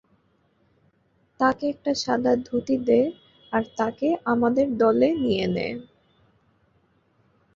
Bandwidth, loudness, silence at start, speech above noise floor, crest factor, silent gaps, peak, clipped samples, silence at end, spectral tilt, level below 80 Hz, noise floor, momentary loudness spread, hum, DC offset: 7.6 kHz; -23 LUFS; 1.4 s; 43 dB; 20 dB; none; -6 dBFS; under 0.1%; 1.75 s; -6 dB/octave; -58 dBFS; -65 dBFS; 8 LU; none; under 0.1%